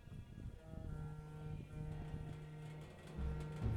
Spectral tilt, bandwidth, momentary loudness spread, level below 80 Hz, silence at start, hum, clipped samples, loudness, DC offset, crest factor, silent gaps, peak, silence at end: -8 dB/octave; 12 kHz; 8 LU; -52 dBFS; 0 s; none; under 0.1%; -50 LUFS; under 0.1%; 18 dB; none; -28 dBFS; 0 s